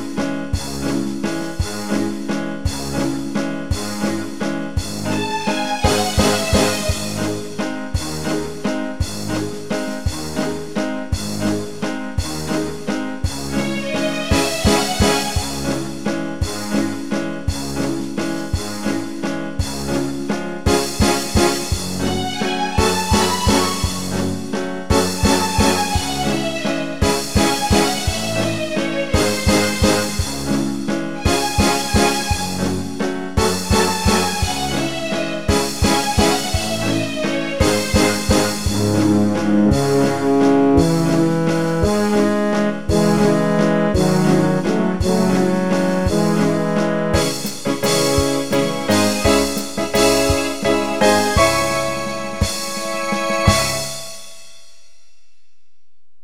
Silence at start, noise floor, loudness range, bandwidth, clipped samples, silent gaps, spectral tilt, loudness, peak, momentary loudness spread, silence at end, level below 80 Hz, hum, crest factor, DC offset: 0 s; -74 dBFS; 7 LU; 16.5 kHz; under 0.1%; none; -4.5 dB/octave; -19 LUFS; -2 dBFS; 8 LU; 1.75 s; -32 dBFS; none; 18 dB; 2%